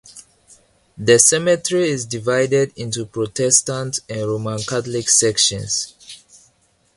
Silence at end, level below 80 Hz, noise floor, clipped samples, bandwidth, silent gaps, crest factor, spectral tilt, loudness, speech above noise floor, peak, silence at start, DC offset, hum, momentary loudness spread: 0.8 s; -54 dBFS; -60 dBFS; under 0.1%; 11.5 kHz; none; 20 dB; -2.5 dB/octave; -17 LUFS; 42 dB; 0 dBFS; 0.1 s; under 0.1%; none; 12 LU